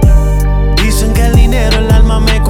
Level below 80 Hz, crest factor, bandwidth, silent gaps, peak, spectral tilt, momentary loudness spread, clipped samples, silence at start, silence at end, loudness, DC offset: -8 dBFS; 8 dB; 15.5 kHz; none; 0 dBFS; -5.5 dB/octave; 3 LU; 0.4%; 0 s; 0 s; -11 LUFS; under 0.1%